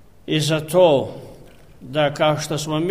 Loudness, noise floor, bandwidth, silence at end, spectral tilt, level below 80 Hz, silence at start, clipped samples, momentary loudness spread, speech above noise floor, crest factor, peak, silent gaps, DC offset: -19 LUFS; -45 dBFS; 15.5 kHz; 0 s; -5 dB/octave; -54 dBFS; 0.3 s; under 0.1%; 12 LU; 27 dB; 18 dB; -2 dBFS; none; 0.4%